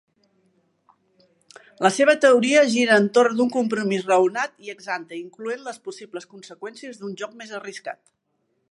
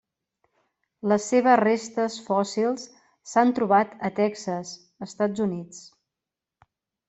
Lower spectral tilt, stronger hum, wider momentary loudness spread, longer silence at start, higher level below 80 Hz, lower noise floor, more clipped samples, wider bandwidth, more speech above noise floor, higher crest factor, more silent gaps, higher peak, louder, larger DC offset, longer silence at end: about the same, -4 dB/octave vs -5 dB/octave; neither; about the same, 20 LU vs 20 LU; first, 1.8 s vs 1.05 s; second, -80 dBFS vs -70 dBFS; second, -72 dBFS vs -88 dBFS; neither; first, 11.5 kHz vs 8.2 kHz; second, 51 dB vs 64 dB; about the same, 20 dB vs 20 dB; neither; about the same, -2 dBFS vs -4 dBFS; first, -20 LUFS vs -24 LUFS; neither; second, 0.8 s vs 1.2 s